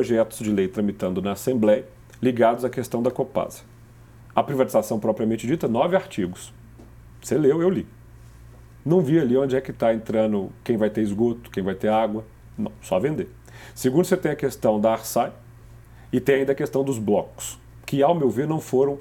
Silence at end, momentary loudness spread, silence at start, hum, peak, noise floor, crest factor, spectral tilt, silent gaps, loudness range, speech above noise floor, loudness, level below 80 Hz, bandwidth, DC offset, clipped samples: 0 s; 13 LU; 0 s; none; -4 dBFS; -47 dBFS; 20 dB; -6.5 dB/octave; none; 2 LU; 25 dB; -23 LUFS; -52 dBFS; 18 kHz; under 0.1%; under 0.1%